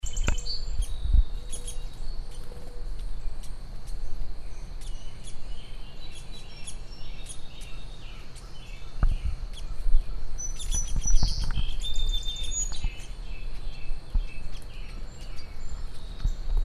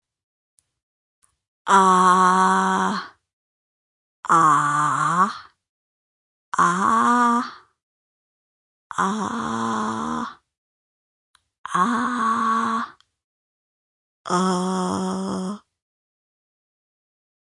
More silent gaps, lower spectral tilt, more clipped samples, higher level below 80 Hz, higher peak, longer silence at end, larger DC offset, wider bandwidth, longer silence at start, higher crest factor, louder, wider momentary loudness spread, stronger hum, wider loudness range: second, none vs 3.33-4.23 s, 5.69-6.52 s, 7.83-8.90 s, 10.58-11.34 s, 11.58-11.64 s, 13.24-14.25 s; second, -3 dB/octave vs -4.5 dB/octave; neither; first, -28 dBFS vs -68 dBFS; about the same, -6 dBFS vs -4 dBFS; second, 0 s vs 1.95 s; neither; about the same, 11.5 kHz vs 11.5 kHz; second, 0.05 s vs 1.65 s; about the same, 20 dB vs 20 dB; second, -36 LUFS vs -20 LUFS; about the same, 15 LU vs 17 LU; neither; first, 12 LU vs 8 LU